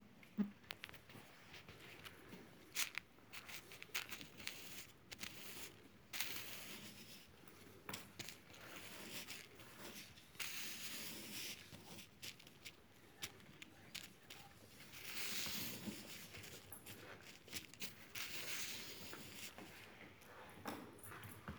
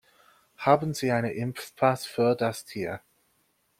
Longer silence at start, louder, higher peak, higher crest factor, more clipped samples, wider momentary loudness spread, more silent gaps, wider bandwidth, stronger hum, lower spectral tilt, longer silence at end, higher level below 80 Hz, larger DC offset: second, 0 s vs 0.6 s; second, -49 LUFS vs -27 LUFS; second, -20 dBFS vs -6 dBFS; first, 32 dB vs 22 dB; neither; first, 15 LU vs 11 LU; neither; first, over 20 kHz vs 16.5 kHz; neither; second, -2 dB/octave vs -6 dB/octave; second, 0 s vs 0.8 s; second, -78 dBFS vs -66 dBFS; neither